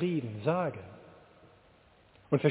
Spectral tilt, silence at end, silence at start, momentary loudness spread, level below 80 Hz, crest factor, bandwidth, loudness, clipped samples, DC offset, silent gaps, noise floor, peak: -7 dB/octave; 0 s; 0 s; 20 LU; -66 dBFS; 20 dB; 4 kHz; -32 LUFS; under 0.1%; under 0.1%; none; -62 dBFS; -12 dBFS